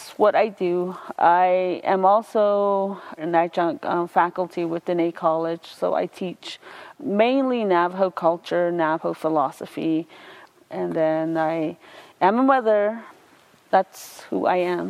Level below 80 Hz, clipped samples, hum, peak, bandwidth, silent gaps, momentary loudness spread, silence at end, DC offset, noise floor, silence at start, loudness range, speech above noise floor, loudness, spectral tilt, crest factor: -76 dBFS; under 0.1%; none; -4 dBFS; 15 kHz; none; 12 LU; 0 s; under 0.1%; -54 dBFS; 0 s; 4 LU; 33 dB; -22 LUFS; -6.5 dB/octave; 18 dB